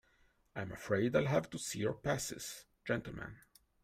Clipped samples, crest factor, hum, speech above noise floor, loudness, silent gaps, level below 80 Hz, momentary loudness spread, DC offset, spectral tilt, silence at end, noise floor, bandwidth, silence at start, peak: under 0.1%; 20 dB; none; 35 dB; -38 LUFS; none; -64 dBFS; 15 LU; under 0.1%; -5 dB/octave; 0.45 s; -72 dBFS; 16 kHz; 0.55 s; -18 dBFS